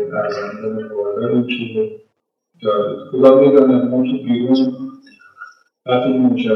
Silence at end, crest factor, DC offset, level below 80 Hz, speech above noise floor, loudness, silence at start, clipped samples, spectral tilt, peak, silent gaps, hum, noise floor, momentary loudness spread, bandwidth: 0 s; 16 dB; under 0.1%; -72 dBFS; 53 dB; -16 LUFS; 0 s; under 0.1%; -8.5 dB/octave; 0 dBFS; none; none; -68 dBFS; 14 LU; 6 kHz